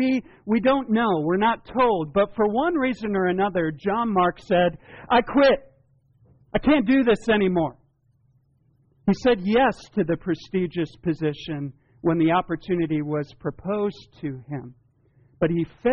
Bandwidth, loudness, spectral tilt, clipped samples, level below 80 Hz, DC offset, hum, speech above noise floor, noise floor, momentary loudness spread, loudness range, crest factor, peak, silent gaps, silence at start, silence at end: 7 kHz; -23 LUFS; -5 dB/octave; under 0.1%; -50 dBFS; under 0.1%; none; 41 dB; -63 dBFS; 11 LU; 4 LU; 14 dB; -10 dBFS; none; 0 s; 0 s